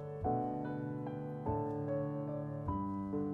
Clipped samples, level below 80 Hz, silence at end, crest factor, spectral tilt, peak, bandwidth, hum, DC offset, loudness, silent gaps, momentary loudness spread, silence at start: under 0.1%; -58 dBFS; 0 s; 14 dB; -11 dB/octave; -24 dBFS; 4.3 kHz; none; under 0.1%; -39 LUFS; none; 4 LU; 0 s